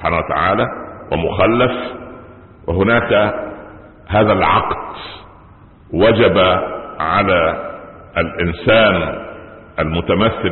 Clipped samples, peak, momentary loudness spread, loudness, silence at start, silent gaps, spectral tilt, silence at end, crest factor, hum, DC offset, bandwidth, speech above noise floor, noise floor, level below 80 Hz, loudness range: under 0.1%; 0 dBFS; 18 LU; -15 LUFS; 0 s; none; -11 dB/octave; 0 s; 16 dB; none; under 0.1%; 4.3 kHz; 28 dB; -43 dBFS; -34 dBFS; 2 LU